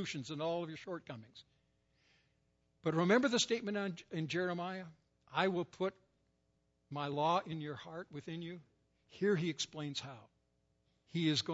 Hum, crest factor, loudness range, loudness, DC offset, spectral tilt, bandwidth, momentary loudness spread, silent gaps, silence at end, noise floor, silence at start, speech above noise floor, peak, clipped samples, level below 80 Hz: none; 22 dB; 6 LU; -38 LUFS; under 0.1%; -4 dB/octave; 7.6 kHz; 15 LU; none; 0 s; -79 dBFS; 0 s; 41 dB; -16 dBFS; under 0.1%; -80 dBFS